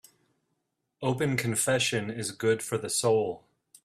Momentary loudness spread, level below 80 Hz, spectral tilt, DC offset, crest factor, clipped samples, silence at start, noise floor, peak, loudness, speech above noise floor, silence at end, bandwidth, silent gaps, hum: 9 LU; -66 dBFS; -4 dB/octave; under 0.1%; 18 dB; under 0.1%; 1 s; -80 dBFS; -12 dBFS; -28 LUFS; 52 dB; 0.45 s; 15.5 kHz; none; none